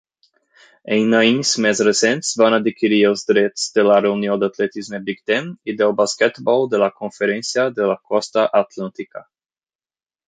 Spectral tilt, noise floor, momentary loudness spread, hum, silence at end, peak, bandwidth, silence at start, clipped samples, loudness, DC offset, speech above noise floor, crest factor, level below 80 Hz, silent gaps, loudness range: -3.5 dB/octave; under -90 dBFS; 11 LU; none; 1.1 s; -2 dBFS; 9.6 kHz; 0.85 s; under 0.1%; -17 LUFS; under 0.1%; over 73 dB; 16 dB; -66 dBFS; none; 4 LU